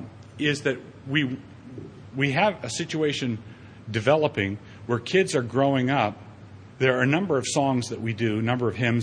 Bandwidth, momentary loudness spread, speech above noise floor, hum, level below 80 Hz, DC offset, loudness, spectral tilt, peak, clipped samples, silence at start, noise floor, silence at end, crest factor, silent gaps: 10.5 kHz; 18 LU; 21 dB; none; -60 dBFS; under 0.1%; -25 LUFS; -5.5 dB/octave; -6 dBFS; under 0.1%; 0 s; -45 dBFS; 0 s; 18 dB; none